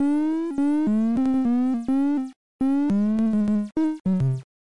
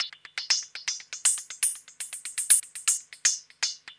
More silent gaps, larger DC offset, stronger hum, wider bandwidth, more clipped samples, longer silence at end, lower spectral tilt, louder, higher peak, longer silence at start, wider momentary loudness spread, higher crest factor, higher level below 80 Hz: first, 2.36-2.59 s, 4.00-4.05 s vs none; first, 0.8% vs under 0.1%; neither; about the same, 11 kHz vs 11 kHz; neither; about the same, 0.15 s vs 0.05 s; first, -9 dB/octave vs 5 dB/octave; about the same, -23 LUFS vs -25 LUFS; second, -14 dBFS vs -2 dBFS; about the same, 0 s vs 0 s; second, 4 LU vs 14 LU; second, 8 dB vs 26 dB; first, -54 dBFS vs -82 dBFS